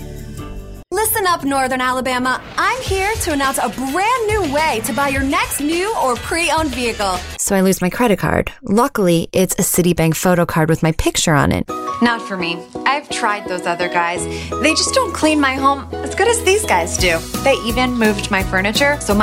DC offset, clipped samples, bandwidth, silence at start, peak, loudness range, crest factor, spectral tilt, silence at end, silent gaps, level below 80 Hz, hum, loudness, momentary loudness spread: under 0.1%; under 0.1%; 16 kHz; 0 s; 0 dBFS; 2 LU; 16 dB; -4 dB/octave; 0 s; none; -34 dBFS; none; -16 LUFS; 6 LU